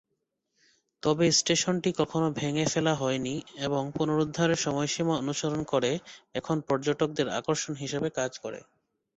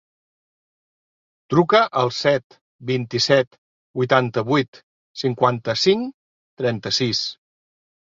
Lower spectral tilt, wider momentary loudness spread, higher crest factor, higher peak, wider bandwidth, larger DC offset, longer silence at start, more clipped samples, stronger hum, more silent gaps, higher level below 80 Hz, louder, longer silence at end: about the same, -4 dB/octave vs -5 dB/octave; second, 8 LU vs 13 LU; about the same, 18 dB vs 20 dB; second, -12 dBFS vs -2 dBFS; first, 8.4 kHz vs 7.6 kHz; neither; second, 1.05 s vs 1.5 s; neither; neither; second, none vs 2.44-2.50 s, 2.61-2.79 s, 3.47-3.51 s, 3.58-3.94 s, 4.68-4.73 s, 4.83-5.14 s, 6.14-6.57 s; about the same, -62 dBFS vs -62 dBFS; second, -28 LUFS vs -20 LUFS; second, 0.55 s vs 0.8 s